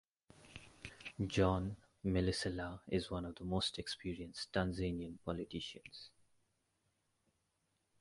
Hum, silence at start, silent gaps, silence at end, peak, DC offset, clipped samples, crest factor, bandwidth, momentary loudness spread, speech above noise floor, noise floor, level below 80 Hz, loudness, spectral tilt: none; 0.4 s; none; 1.95 s; -18 dBFS; under 0.1%; under 0.1%; 22 dB; 11.5 kHz; 19 LU; 43 dB; -83 dBFS; -56 dBFS; -40 LUFS; -5.5 dB/octave